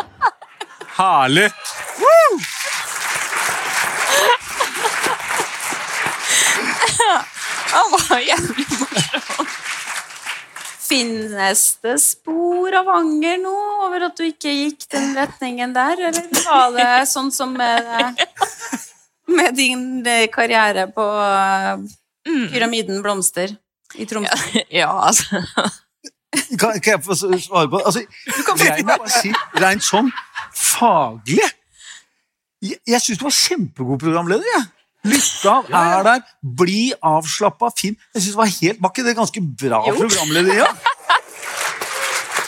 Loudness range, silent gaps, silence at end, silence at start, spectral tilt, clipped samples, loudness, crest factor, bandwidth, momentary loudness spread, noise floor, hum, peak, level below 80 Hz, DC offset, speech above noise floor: 3 LU; none; 0 s; 0 s; -2.5 dB/octave; under 0.1%; -17 LUFS; 16 dB; 17 kHz; 10 LU; -71 dBFS; none; -2 dBFS; -60 dBFS; under 0.1%; 54 dB